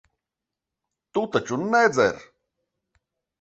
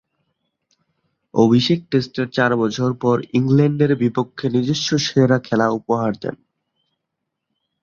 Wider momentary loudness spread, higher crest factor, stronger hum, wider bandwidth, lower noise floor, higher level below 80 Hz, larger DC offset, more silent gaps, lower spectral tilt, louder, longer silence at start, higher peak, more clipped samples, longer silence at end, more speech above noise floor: first, 11 LU vs 7 LU; about the same, 22 dB vs 18 dB; neither; first, 8.2 kHz vs 7.4 kHz; first, -87 dBFS vs -79 dBFS; about the same, -62 dBFS vs -58 dBFS; neither; neither; second, -4.5 dB/octave vs -6 dB/octave; second, -22 LUFS vs -18 LUFS; second, 1.15 s vs 1.35 s; second, -6 dBFS vs -2 dBFS; neither; second, 1.2 s vs 1.5 s; first, 65 dB vs 61 dB